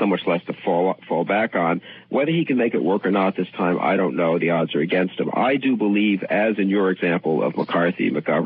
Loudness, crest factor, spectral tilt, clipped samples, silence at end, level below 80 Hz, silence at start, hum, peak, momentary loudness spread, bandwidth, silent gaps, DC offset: -21 LUFS; 12 dB; -11 dB/octave; under 0.1%; 0 s; -72 dBFS; 0 s; none; -8 dBFS; 4 LU; 5 kHz; none; under 0.1%